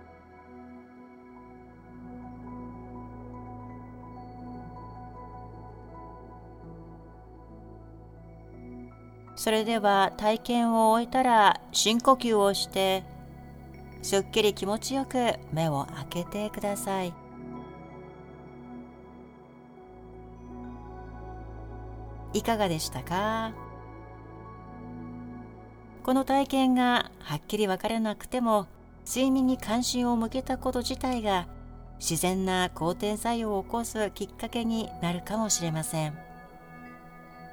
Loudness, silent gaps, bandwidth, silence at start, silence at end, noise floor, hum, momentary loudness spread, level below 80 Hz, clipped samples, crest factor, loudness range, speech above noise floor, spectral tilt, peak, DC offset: -27 LUFS; none; over 20 kHz; 0 s; 0 s; -50 dBFS; none; 24 LU; -50 dBFS; under 0.1%; 22 dB; 21 LU; 24 dB; -4 dB/octave; -8 dBFS; under 0.1%